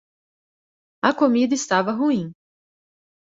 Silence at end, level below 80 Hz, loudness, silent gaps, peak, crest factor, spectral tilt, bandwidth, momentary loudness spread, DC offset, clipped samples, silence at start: 1 s; -68 dBFS; -21 LUFS; none; -4 dBFS; 20 dB; -4.5 dB/octave; 8 kHz; 6 LU; under 0.1%; under 0.1%; 1.05 s